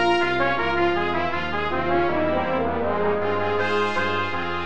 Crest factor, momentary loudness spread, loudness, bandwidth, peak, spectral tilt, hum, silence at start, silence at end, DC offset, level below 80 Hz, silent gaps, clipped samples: 14 dB; 3 LU; -23 LUFS; 8.6 kHz; -8 dBFS; -6 dB/octave; none; 0 s; 0 s; 2%; -44 dBFS; none; under 0.1%